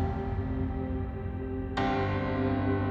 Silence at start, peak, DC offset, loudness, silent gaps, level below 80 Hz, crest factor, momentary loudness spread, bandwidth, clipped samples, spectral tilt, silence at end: 0 s; -16 dBFS; under 0.1%; -31 LUFS; none; -40 dBFS; 14 dB; 7 LU; 7 kHz; under 0.1%; -8.5 dB/octave; 0 s